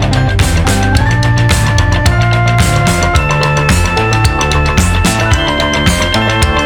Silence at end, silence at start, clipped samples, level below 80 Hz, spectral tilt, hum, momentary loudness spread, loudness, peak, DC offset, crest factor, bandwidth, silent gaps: 0 s; 0 s; under 0.1%; -18 dBFS; -4.5 dB/octave; none; 1 LU; -11 LUFS; 0 dBFS; under 0.1%; 10 dB; 19.5 kHz; none